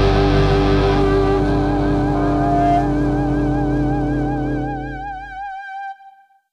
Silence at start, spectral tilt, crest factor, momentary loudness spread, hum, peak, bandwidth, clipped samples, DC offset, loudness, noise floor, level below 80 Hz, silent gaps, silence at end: 0 s; -8 dB/octave; 14 dB; 14 LU; none; -4 dBFS; 9.6 kHz; under 0.1%; under 0.1%; -18 LUFS; -47 dBFS; -26 dBFS; none; 0.4 s